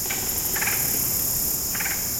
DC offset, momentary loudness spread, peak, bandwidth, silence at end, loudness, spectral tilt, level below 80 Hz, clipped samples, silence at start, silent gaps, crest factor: under 0.1%; 2 LU; -10 dBFS; 16.5 kHz; 0 s; -22 LUFS; -1 dB/octave; -44 dBFS; under 0.1%; 0 s; none; 16 dB